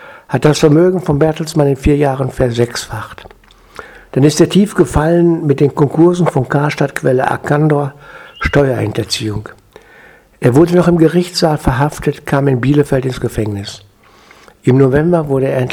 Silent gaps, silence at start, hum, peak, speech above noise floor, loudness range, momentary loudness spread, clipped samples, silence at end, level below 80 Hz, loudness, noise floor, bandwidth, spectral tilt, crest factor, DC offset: none; 0 s; none; 0 dBFS; 32 dB; 4 LU; 11 LU; 0.2%; 0 s; -32 dBFS; -13 LUFS; -44 dBFS; 15.5 kHz; -6.5 dB/octave; 12 dB; under 0.1%